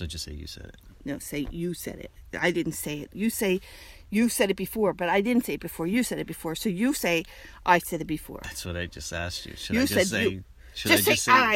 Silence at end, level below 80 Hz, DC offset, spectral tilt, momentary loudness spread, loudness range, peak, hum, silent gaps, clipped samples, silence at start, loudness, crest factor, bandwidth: 0 s; -48 dBFS; under 0.1%; -4 dB/octave; 15 LU; 4 LU; -6 dBFS; none; none; under 0.1%; 0 s; -27 LUFS; 22 dB; 16.5 kHz